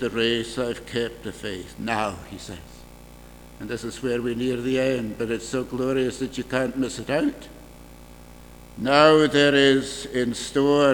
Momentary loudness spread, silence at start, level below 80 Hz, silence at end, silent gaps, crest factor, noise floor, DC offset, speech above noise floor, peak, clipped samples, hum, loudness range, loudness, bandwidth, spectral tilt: 17 LU; 0 s; -48 dBFS; 0 s; none; 22 dB; -45 dBFS; under 0.1%; 22 dB; 0 dBFS; under 0.1%; 60 Hz at -50 dBFS; 10 LU; -23 LUFS; 19.5 kHz; -4.5 dB/octave